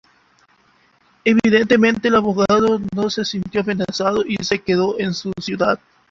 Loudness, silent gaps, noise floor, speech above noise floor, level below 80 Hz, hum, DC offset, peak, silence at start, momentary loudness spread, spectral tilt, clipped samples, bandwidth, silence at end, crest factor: -18 LUFS; none; -57 dBFS; 39 dB; -52 dBFS; none; under 0.1%; -2 dBFS; 1.25 s; 8 LU; -5.5 dB/octave; under 0.1%; 7.6 kHz; 0.35 s; 16 dB